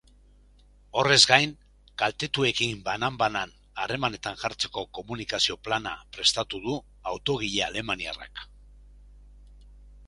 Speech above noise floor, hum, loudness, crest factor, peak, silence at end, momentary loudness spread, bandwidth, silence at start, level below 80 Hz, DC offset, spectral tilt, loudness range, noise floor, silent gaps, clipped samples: 29 dB; 50 Hz at -55 dBFS; -26 LUFS; 28 dB; 0 dBFS; 0 s; 16 LU; 11.5 kHz; 0.95 s; -52 dBFS; under 0.1%; -2.5 dB/octave; 8 LU; -56 dBFS; none; under 0.1%